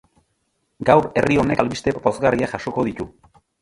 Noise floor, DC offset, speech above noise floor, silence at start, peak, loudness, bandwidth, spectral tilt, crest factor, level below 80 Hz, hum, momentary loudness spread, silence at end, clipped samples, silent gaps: -70 dBFS; under 0.1%; 51 dB; 0.8 s; 0 dBFS; -19 LUFS; 11.5 kHz; -6.5 dB/octave; 20 dB; -46 dBFS; none; 9 LU; 0.55 s; under 0.1%; none